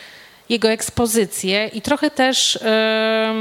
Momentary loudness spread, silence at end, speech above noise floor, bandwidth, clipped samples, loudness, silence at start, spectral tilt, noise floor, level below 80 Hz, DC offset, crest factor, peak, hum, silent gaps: 4 LU; 0 s; 25 dB; 17 kHz; under 0.1%; -18 LUFS; 0 s; -2.5 dB/octave; -43 dBFS; -50 dBFS; under 0.1%; 18 dB; -2 dBFS; none; none